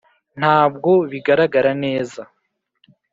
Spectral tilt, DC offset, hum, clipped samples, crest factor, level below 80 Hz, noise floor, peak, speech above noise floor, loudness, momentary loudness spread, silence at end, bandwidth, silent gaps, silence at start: -7 dB/octave; under 0.1%; none; under 0.1%; 16 dB; -62 dBFS; -70 dBFS; -2 dBFS; 54 dB; -17 LUFS; 10 LU; 0.9 s; 7.8 kHz; none; 0.35 s